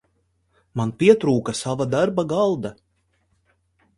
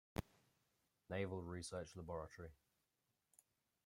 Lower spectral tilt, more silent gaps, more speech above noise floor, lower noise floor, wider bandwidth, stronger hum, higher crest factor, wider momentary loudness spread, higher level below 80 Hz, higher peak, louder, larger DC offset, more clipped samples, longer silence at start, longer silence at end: about the same, -6 dB/octave vs -5.5 dB/octave; neither; first, 48 dB vs 39 dB; second, -68 dBFS vs -88 dBFS; second, 11.5 kHz vs 16 kHz; neither; about the same, 22 dB vs 24 dB; about the same, 12 LU vs 10 LU; first, -58 dBFS vs -70 dBFS; first, -2 dBFS vs -28 dBFS; first, -21 LUFS vs -50 LUFS; neither; neither; first, 0.75 s vs 0.15 s; about the same, 1.25 s vs 1.3 s